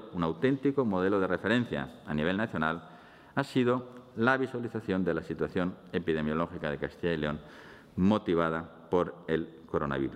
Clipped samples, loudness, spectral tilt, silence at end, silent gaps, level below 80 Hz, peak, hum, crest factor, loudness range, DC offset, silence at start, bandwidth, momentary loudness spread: under 0.1%; -31 LUFS; -7.5 dB/octave; 0 s; none; -58 dBFS; -10 dBFS; none; 20 dB; 2 LU; under 0.1%; 0 s; 11.5 kHz; 8 LU